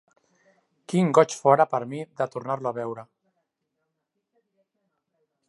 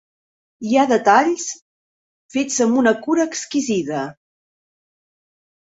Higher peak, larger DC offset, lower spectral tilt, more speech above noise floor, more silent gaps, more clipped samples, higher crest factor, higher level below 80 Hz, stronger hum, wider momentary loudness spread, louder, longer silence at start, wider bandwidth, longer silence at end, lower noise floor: about the same, -4 dBFS vs -2 dBFS; neither; first, -6 dB/octave vs -3.5 dB/octave; second, 57 dB vs over 72 dB; second, none vs 1.62-2.29 s; neither; about the same, 24 dB vs 20 dB; second, -78 dBFS vs -66 dBFS; neither; about the same, 15 LU vs 14 LU; second, -24 LUFS vs -18 LUFS; first, 0.9 s vs 0.6 s; first, 11.5 kHz vs 8 kHz; first, 2.45 s vs 1.5 s; second, -80 dBFS vs under -90 dBFS